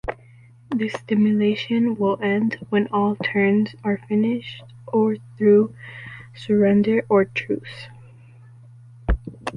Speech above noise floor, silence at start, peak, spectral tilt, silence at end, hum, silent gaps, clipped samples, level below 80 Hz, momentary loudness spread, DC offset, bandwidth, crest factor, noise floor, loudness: 28 dB; 0.05 s; -6 dBFS; -8 dB/octave; 0 s; none; none; under 0.1%; -38 dBFS; 20 LU; under 0.1%; 9.4 kHz; 16 dB; -48 dBFS; -21 LUFS